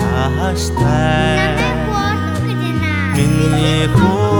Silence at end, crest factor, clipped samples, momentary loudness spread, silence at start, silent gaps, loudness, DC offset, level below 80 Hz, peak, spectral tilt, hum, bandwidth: 0 s; 12 dB; under 0.1%; 5 LU; 0 s; none; -15 LUFS; under 0.1%; -26 dBFS; -2 dBFS; -6 dB/octave; none; 19 kHz